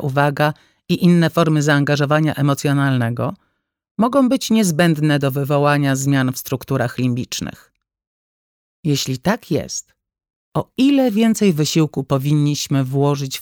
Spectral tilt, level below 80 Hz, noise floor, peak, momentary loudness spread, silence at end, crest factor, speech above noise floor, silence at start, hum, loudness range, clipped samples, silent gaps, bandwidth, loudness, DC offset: -5.5 dB/octave; -54 dBFS; under -90 dBFS; -2 dBFS; 10 LU; 0 s; 16 dB; over 73 dB; 0 s; none; 6 LU; under 0.1%; 3.91-3.95 s, 8.07-8.83 s, 10.36-10.52 s; 18.5 kHz; -18 LUFS; under 0.1%